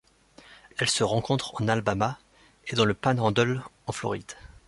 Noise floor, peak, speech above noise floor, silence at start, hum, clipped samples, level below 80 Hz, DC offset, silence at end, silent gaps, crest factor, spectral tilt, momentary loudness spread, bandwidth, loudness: -55 dBFS; -8 dBFS; 28 dB; 0.5 s; none; under 0.1%; -56 dBFS; under 0.1%; 0.2 s; none; 20 dB; -4.5 dB/octave; 13 LU; 11.5 kHz; -27 LUFS